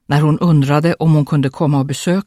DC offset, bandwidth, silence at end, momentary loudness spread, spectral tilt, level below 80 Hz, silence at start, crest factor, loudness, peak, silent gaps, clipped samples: under 0.1%; 13 kHz; 0.05 s; 4 LU; -7 dB/octave; -50 dBFS; 0.1 s; 12 dB; -14 LUFS; 0 dBFS; none; under 0.1%